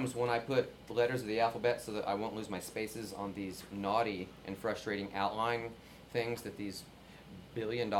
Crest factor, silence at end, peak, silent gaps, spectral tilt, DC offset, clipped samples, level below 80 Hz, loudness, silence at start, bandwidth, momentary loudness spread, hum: 20 dB; 0 s; -18 dBFS; none; -5 dB/octave; under 0.1%; under 0.1%; -64 dBFS; -37 LUFS; 0 s; 17 kHz; 12 LU; none